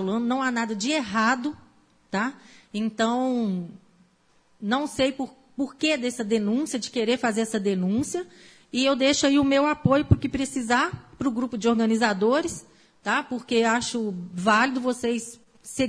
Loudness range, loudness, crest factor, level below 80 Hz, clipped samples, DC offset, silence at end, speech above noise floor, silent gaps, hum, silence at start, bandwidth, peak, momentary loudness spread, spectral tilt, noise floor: 5 LU; -25 LUFS; 22 dB; -50 dBFS; under 0.1%; under 0.1%; 0 s; 38 dB; none; none; 0 s; 11 kHz; -4 dBFS; 12 LU; -4.5 dB/octave; -62 dBFS